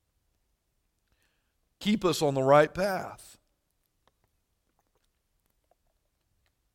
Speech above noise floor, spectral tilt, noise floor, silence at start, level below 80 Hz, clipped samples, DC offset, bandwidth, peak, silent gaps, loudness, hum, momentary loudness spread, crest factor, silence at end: 51 dB; -5.5 dB/octave; -77 dBFS; 1.8 s; -62 dBFS; under 0.1%; under 0.1%; 16.5 kHz; -8 dBFS; none; -26 LUFS; none; 13 LU; 24 dB; 3.6 s